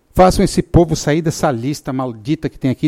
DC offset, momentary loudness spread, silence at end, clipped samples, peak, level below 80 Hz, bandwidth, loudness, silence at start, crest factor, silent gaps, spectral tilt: under 0.1%; 10 LU; 0 s; under 0.1%; 0 dBFS; -30 dBFS; 16 kHz; -16 LUFS; 0.15 s; 14 dB; none; -6 dB/octave